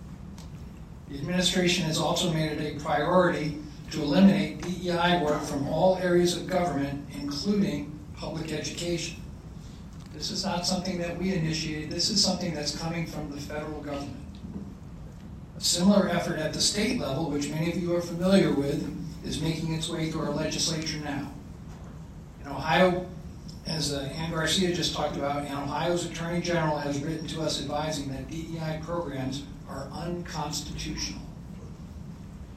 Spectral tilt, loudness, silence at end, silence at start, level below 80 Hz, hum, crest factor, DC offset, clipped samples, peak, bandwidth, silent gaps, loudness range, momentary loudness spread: -4.5 dB/octave; -28 LUFS; 0 s; 0 s; -48 dBFS; none; 20 dB; under 0.1%; under 0.1%; -8 dBFS; 14 kHz; none; 8 LU; 20 LU